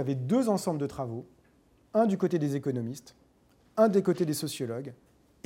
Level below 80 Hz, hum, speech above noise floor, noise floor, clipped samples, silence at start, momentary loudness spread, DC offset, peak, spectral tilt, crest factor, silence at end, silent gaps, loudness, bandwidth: -68 dBFS; none; 35 dB; -64 dBFS; under 0.1%; 0 s; 14 LU; under 0.1%; -10 dBFS; -6.5 dB/octave; 20 dB; 0.5 s; none; -29 LUFS; 16.5 kHz